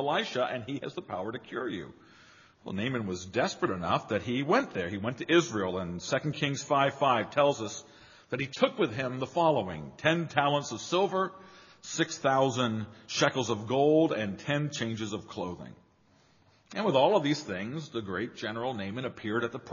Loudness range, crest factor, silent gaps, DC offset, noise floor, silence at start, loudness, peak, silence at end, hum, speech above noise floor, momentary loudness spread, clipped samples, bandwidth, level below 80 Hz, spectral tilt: 4 LU; 24 dB; none; under 0.1%; -64 dBFS; 0 s; -30 LUFS; -6 dBFS; 0 s; none; 34 dB; 12 LU; under 0.1%; 7.2 kHz; -68 dBFS; -4 dB/octave